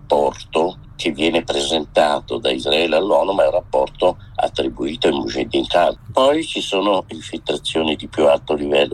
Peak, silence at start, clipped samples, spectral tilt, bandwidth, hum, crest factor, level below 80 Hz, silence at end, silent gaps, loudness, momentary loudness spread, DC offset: -2 dBFS; 0 s; under 0.1%; -4 dB/octave; 12.5 kHz; none; 16 dB; -44 dBFS; 0 s; none; -18 LUFS; 7 LU; under 0.1%